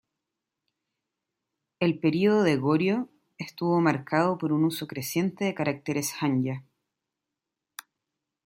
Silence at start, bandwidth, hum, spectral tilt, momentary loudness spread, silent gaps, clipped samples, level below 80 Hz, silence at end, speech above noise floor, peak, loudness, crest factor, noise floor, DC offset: 1.8 s; 16.5 kHz; none; -6 dB/octave; 17 LU; none; under 0.1%; -72 dBFS; 1.85 s; 61 dB; -8 dBFS; -26 LUFS; 20 dB; -87 dBFS; under 0.1%